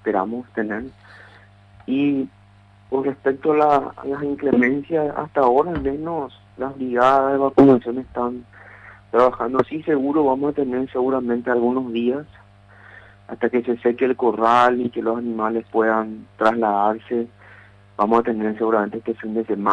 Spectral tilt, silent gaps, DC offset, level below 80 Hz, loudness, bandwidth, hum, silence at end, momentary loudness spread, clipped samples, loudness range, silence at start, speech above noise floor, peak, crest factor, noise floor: -8 dB/octave; none; under 0.1%; -52 dBFS; -20 LUFS; 8.4 kHz; 50 Hz at -50 dBFS; 0 s; 11 LU; under 0.1%; 4 LU; 0.05 s; 30 dB; -2 dBFS; 18 dB; -50 dBFS